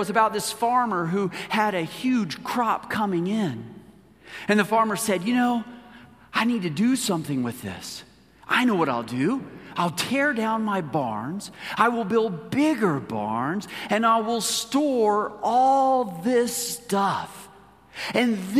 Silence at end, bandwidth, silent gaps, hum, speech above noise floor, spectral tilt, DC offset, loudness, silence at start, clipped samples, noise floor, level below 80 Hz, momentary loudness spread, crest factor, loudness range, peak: 0 s; 15.5 kHz; none; none; 27 dB; -4.5 dB/octave; under 0.1%; -24 LUFS; 0 s; under 0.1%; -50 dBFS; -64 dBFS; 11 LU; 20 dB; 3 LU; -4 dBFS